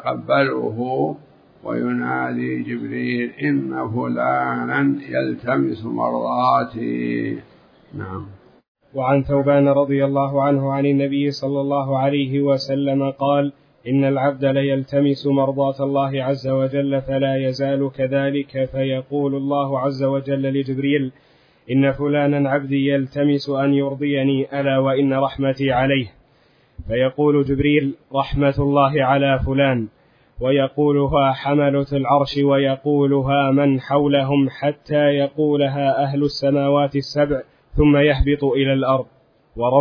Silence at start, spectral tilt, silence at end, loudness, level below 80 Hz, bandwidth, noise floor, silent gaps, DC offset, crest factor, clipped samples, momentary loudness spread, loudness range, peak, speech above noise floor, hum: 0 s; -8.5 dB/octave; 0 s; -19 LUFS; -40 dBFS; 5.4 kHz; -56 dBFS; 8.68-8.75 s; under 0.1%; 16 dB; under 0.1%; 7 LU; 4 LU; -2 dBFS; 38 dB; none